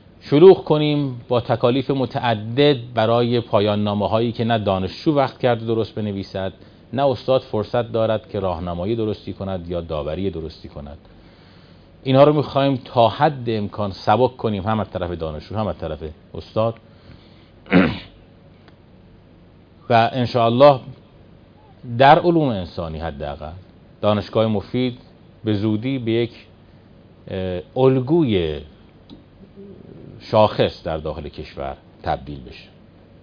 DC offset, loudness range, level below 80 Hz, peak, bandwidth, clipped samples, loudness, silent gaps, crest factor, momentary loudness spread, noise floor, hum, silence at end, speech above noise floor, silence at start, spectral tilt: under 0.1%; 7 LU; -46 dBFS; 0 dBFS; 5.2 kHz; under 0.1%; -19 LUFS; none; 20 dB; 18 LU; -48 dBFS; none; 0.6 s; 29 dB; 0.25 s; -8.5 dB/octave